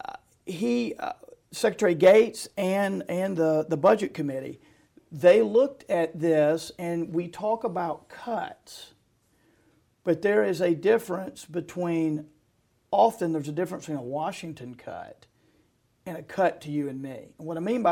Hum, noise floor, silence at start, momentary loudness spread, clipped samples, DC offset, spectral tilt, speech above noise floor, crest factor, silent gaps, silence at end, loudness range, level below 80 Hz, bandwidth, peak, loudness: none; -68 dBFS; 0.1 s; 20 LU; under 0.1%; under 0.1%; -6 dB/octave; 43 dB; 20 dB; none; 0 s; 9 LU; -68 dBFS; 17 kHz; -6 dBFS; -26 LUFS